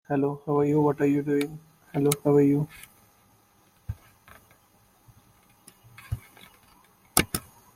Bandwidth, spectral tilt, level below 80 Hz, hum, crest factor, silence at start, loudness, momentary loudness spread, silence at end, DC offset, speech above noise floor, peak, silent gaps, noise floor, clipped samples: 16.5 kHz; -5.5 dB/octave; -54 dBFS; none; 28 dB; 0.1 s; -26 LUFS; 20 LU; 0.35 s; under 0.1%; 38 dB; -2 dBFS; none; -62 dBFS; under 0.1%